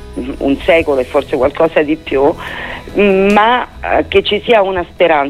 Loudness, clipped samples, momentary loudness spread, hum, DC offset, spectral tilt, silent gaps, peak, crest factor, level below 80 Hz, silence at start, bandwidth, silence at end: -13 LUFS; under 0.1%; 9 LU; none; under 0.1%; -6 dB/octave; none; 0 dBFS; 12 dB; -34 dBFS; 0 s; 13.5 kHz; 0 s